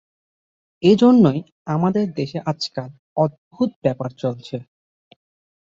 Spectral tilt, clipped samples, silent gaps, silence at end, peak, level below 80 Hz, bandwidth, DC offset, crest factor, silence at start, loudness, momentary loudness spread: -7.5 dB/octave; under 0.1%; 1.52-1.65 s, 2.99-3.16 s, 3.38-3.51 s, 3.76-3.82 s; 1.15 s; -2 dBFS; -60 dBFS; 7.6 kHz; under 0.1%; 18 dB; 0.8 s; -20 LUFS; 16 LU